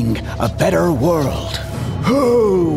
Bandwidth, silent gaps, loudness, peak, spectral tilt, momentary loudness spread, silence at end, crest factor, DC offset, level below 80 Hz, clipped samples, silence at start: 16 kHz; none; -17 LUFS; -2 dBFS; -6.5 dB/octave; 10 LU; 0 s; 14 dB; under 0.1%; -32 dBFS; under 0.1%; 0 s